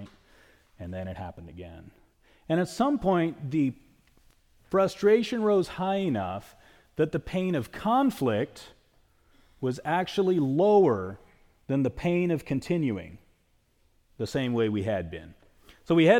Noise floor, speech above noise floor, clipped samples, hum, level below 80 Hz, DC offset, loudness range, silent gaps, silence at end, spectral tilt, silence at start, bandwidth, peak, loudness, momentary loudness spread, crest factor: -67 dBFS; 41 dB; under 0.1%; none; -56 dBFS; under 0.1%; 5 LU; none; 0 s; -7 dB/octave; 0 s; 17 kHz; -8 dBFS; -27 LUFS; 17 LU; 20 dB